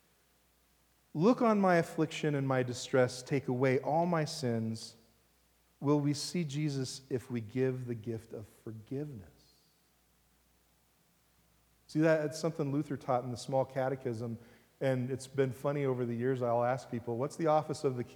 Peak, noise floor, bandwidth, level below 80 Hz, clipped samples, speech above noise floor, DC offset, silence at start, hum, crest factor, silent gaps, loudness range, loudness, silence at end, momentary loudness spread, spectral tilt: -14 dBFS; -70 dBFS; over 20 kHz; -74 dBFS; under 0.1%; 38 dB; under 0.1%; 1.15 s; none; 20 dB; none; 10 LU; -33 LUFS; 0 s; 12 LU; -6.5 dB/octave